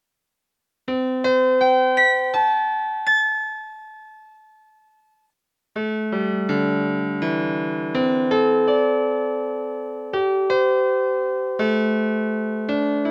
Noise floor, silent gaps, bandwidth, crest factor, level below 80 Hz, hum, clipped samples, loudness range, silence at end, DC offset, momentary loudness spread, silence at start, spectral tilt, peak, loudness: -80 dBFS; none; 8.4 kHz; 14 dB; -70 dBFS; none; under 0.1%; 7 LU; 0 s; under 0.1%; 10 LU; 0.85 s; -6.5 dB/octave; -8 dBFS; -21 LUFS